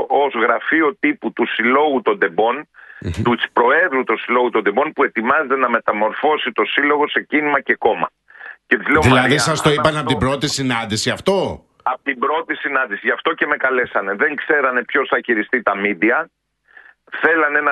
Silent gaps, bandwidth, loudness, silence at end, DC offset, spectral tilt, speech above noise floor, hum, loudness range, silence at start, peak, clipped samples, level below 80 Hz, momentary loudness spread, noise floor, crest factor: none; 12 kHz; -17 LUFS; 0 s; under 0.1%; -4.5 dB/octave; 30 dB; none; 3 LU; 0 s; 0 dBFS; under 0.1%; -46 dBFS; 6 LU; -48 dBFS; 18 dB